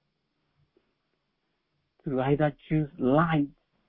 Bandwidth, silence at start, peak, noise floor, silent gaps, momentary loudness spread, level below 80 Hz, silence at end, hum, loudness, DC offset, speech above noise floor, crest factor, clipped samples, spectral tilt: 4 kHz; 2.05 s; -10 dBFS; -78 dBFS; none; 10 LU; -56 dBFS; 0.4 s; none; -27 LUFS; under 0.1%; 52 dB; 20 dB; under 0.1%; -11.5 dB/octave